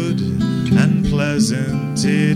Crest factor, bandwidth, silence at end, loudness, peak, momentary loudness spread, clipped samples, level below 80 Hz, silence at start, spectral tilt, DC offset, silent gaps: 14 dB; 14 kHz; 0 s; -17 LUFS; -4 dBFS; 5 LU; under 0.1%; -36 dBFS; 0 s; -6 dB/octave; under 0.1%; none